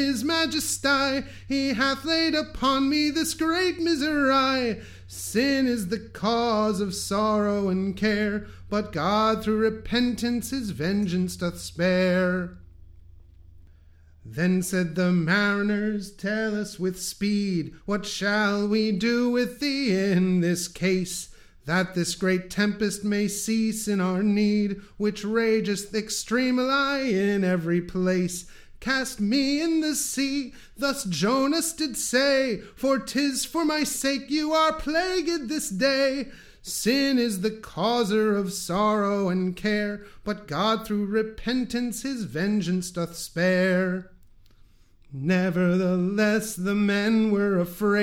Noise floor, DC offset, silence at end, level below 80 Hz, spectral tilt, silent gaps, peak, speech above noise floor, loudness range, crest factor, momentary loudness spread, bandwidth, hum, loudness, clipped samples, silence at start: -54 dBFS; under 0.1%; 0 s; -52 dBFS; -4.5 dB/octave; none; -10 dBFS; 29 dB; 3 LU; 16 dB; 8 LU; 16.5 kHz; none; -25 LUFS; under 0.1%; 0 s